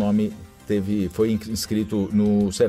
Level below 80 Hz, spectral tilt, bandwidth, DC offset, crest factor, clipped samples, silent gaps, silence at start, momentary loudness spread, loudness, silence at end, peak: -48 dBFS; -6.5 dB/octave; 15 kHz; under 0.1%; 14 dB; under 0.1%; none; 0 s; 6 LU; -23 LUFS; 0 s; -8 dBFS